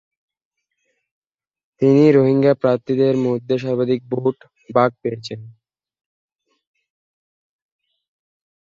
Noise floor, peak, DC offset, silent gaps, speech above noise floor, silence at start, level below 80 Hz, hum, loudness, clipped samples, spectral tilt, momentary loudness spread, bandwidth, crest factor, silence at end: -71 dBFS; -2 dBFS; under 0.1%; none; 55 dB; 1.8 s; -64 dBFS; none; -17 LUFS; under 0.1%; -8.5 dB/octave; 15 LU; 7.4 kHz; 18 dB; 3.15 s